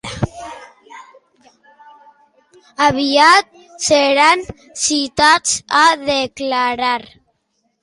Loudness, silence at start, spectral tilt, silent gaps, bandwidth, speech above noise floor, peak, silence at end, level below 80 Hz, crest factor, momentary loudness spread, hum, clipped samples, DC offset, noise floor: -14 LUFS; 0.05 s; -2.5 dB/octave; none; 11.5 kHz; 53 dB; 0 dBFS; 0.8 s; -46 dBFS; 16 dB; 14 LU; none; under 0.1%; under 0.1%; -67 dBFS